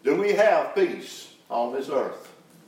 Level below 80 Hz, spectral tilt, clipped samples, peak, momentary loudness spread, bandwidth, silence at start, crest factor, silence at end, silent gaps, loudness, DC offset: -88 dBFS; -4.5 dB/octave; under 0.1%; -8 dBFS; 19 LU; 16 kHz; 0.05 s; 16 dB; 0.35 s; none; -24 LUFS; under 0.1%